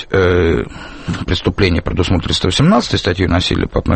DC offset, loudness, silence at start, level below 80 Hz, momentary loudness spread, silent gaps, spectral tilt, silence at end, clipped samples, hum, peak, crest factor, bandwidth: under 0.1%; -15 LUFS; 0 s; -28 dBFS; 9 LU; none; -5.5 dB/octave; 0 s; under 0.1%; none; 0 dBFS; 14 dB; 8.8 kHz